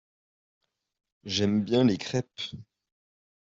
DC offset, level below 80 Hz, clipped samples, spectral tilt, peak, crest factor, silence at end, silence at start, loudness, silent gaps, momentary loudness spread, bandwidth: under 0.1%; -64 dBFS; under 0.1%; -5.5 dB/octave; -12 dBFS; 20 dB; 0.8 s; 1.25 s; -27 LUFS; none; 18 LU; 7.8 kHz